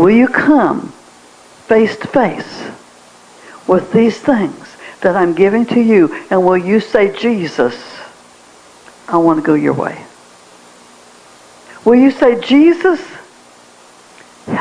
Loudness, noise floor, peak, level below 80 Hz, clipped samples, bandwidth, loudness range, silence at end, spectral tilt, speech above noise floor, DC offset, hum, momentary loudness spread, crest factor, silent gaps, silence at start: -12 LUFS; -42 dBFS; 0 dBFS; -52 dBFS; under 0.1%; 10.5 kHz; 5 LU; 0 s; -6.5 dB/octave; 31 dB; under 0.1%; 60 Hz at -40 dBFS; 20 LU; 14 dB; none; 0 s